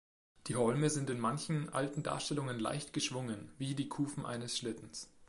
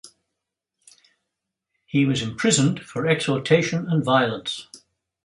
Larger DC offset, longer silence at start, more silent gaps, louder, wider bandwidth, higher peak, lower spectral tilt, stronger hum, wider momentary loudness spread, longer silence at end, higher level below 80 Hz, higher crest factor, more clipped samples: neither; first, 0.45 s vs 0.05 s; neither; second, -37 LUFS vs -22 LUFS; about the same, 11.5 kHz vs 11.5 kHz; second, -20 dBFS vs -4 dBFS; about the same, -5 dB/octave vs -4.5 dB/octave; neither; about the same, 9 LU vs 8 LU; second, 0.05 s vs 0.45 s; second, -70 dBFS vs -60 dBFS; about the same, 18 dB vs 20 dB; neither